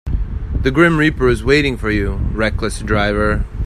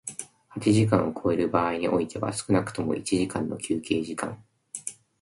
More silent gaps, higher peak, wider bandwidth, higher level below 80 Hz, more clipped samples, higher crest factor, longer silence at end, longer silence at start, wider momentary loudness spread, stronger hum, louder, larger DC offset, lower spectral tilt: neither; first, 0 dBFS vs -8 dBFS; first, 13.5 kHz vs 11.5 kHz; first, -22 dBFS vs -54 dBFS; neither; about the same, 16 dB vs 18 dB; second, 0 s vs 0.3 s; about the same, 0.05 s vs 0.05 s; second, 9 LU vs 14 LU; neither; first, -16 LUFS vs -27 LUFS; neither; about the same, -6.5 dB/octave vs -5.5 dB/octave